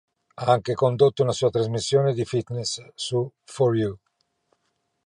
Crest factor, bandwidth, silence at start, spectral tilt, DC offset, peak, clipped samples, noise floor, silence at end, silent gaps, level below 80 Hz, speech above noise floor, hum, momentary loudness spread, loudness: 18 dB; 10.5 kHz; 0.4 s; -6 dB/octave; under 0.1%; -6 dBFS; under 0.1%; -74 dBFS; 1.1 s; none; -58 dBFS; 51 dB; none; 9 LU; -24 LUFS